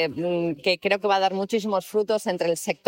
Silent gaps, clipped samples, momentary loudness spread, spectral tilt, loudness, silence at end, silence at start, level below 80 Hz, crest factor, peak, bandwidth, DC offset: none; under 0.1%; 4 LU; -4.5 dB/octave; -24 LUFS; 0.15 s; 0 s; -68 dBFS; 16 dB; -8 dBFS; 16.5 kHz; under 0.1%